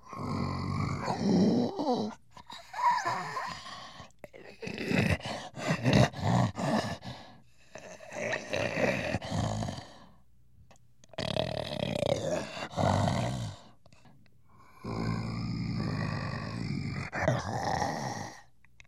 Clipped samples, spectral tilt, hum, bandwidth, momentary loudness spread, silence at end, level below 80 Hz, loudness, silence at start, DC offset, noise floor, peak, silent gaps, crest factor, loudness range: under 0.1%; -6 dB/octave; none; 13.5 kHz; 18 LU; 0.45 s; -54 dBFS; -32 LUFS; 0.05 s; 0.1%; -63 dBFS; -10 dBFS; none; 22 dB; 5 LU